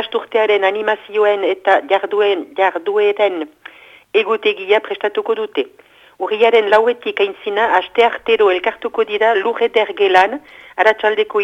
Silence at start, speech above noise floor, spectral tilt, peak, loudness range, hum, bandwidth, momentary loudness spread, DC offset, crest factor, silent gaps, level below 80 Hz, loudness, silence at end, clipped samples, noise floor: 0 s; 25 dB; -4 dB/octave; 0 dBFS; 3 LU; none; 7.8 kHz; 7 LU; under 0.1%; 16 dB; none; -62 dBFS; -15 LUFS; 0 s; under 0.1%; -40 dBFS